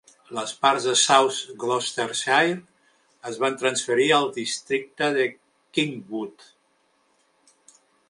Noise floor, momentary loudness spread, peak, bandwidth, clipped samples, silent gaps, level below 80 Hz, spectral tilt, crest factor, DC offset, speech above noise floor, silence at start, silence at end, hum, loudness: -66 dBFS; 14 LU; -2 dBFS; 11.5 kHz; under 0.1%; none; -76 dBFS; -2 dB/octave; 22 dB; under 0.1%; 43 dB; 0.3 s; 1.8 s; none; -23 LUFS